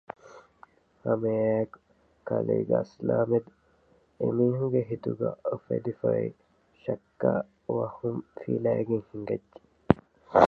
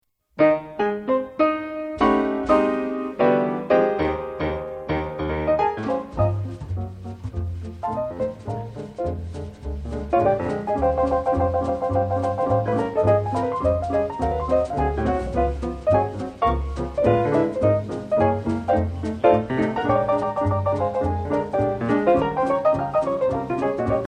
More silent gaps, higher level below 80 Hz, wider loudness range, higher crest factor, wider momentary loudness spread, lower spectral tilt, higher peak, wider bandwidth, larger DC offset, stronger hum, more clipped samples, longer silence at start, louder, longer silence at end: neither; second, -58 dBFS vs -38 dBFS; second, 2 LU vs 5 LU; first, 28 dB vs 18 dB; about the same, 9 LU vs 11 LU; about the same, -9.5 dB/octave vs -8.5 dB/octave; first, 0 dBFS vs -4 dBFS; second, 7 kHz vs 9.8 kHz; neither; neither; neither; about the same, 0.25 s vs 0.35 s; second, -29 LUFS vs -23 LUFS; about the same, 0 s vs 0.05 s